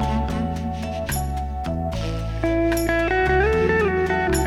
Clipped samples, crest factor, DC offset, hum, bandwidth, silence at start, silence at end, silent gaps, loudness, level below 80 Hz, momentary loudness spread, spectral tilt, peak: under 0.1%; 14 dB; under 0.1%; none; 16 kHz; 0 s; 0 s; none; -22 LUFS; -30 dBFS; 9 LU; -6 dB/octave; -6 dBFS